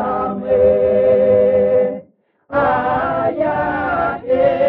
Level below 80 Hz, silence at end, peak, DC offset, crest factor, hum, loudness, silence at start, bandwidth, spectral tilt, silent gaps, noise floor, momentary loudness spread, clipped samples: -44 dBFS; 0 s; -4 dBFS; under 0.1%; 12 dB; none; -16 LUFS; 0 s; 4.3 kHz; -5.5 dB/octave; none; -50 dBFS; 7 LU; under 0.1%